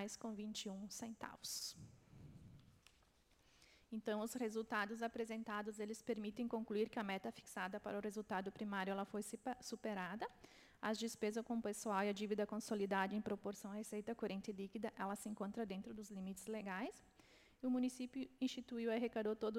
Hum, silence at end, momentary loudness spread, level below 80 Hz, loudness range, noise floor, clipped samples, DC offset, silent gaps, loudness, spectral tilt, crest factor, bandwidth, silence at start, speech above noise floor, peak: none; 0 s; 9 LU; -78 dBFS; 7 LU; -74 dBFS; under 0.1%; under 0.1%; none; -45 LUFS; -4.5 dB/octave; 20 dB; 16.5 kHz; 0 s; 29 dB; -26 dBFS